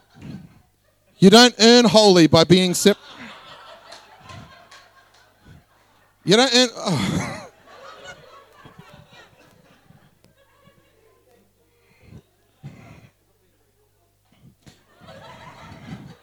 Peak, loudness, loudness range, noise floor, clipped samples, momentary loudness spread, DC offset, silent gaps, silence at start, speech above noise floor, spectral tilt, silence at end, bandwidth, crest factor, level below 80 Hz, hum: -2 dBFS; -14 LUFS; 16 LU; -62 dBFS; under 0.1%; 29 LU; under 0.1%; none; 0.25 s; 48 dB; -4 dB/octave; 0.25 s; 16.5 kHz; 20 dB; -58 dBFS; 50 Hz at -55 dBFS